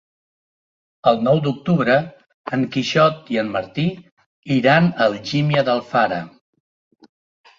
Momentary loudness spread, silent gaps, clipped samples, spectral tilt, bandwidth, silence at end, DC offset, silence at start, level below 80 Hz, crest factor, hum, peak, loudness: 10 LU; 2.34-2.44 s, 4.12-4.17 s, 4.26-4.43 s; under 0.1%; -6.5 dB/octave; 7.6 kHz; 1.3 s; under 0.1%; 1.05 s; -58 dBFS; 18 dB; none; -2 dBFS; -19 LUFS